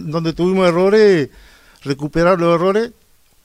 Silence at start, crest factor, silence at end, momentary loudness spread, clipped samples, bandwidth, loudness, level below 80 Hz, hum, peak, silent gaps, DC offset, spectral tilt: 0 s; 14 dB; 0.55 s; 14 LU; under 0.1%; 12.5 kHz; -15 LUFS; -42 dBFS; none; -2 dBFS; none; under 0.1%; -7 dB/octave